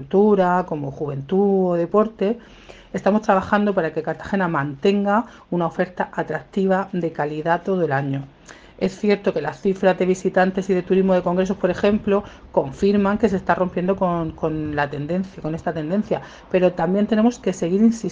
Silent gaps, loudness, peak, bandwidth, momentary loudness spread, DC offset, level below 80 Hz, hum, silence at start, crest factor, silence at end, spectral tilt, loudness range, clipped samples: none; -21 LUFS; -2 dBFS; 7.8 kHz; 8 LU; under 0.1%; -50 dBFS; none; 0 s; 18 dB; 0 s; -7.5 dB/octave; 3 LU; under 0.1%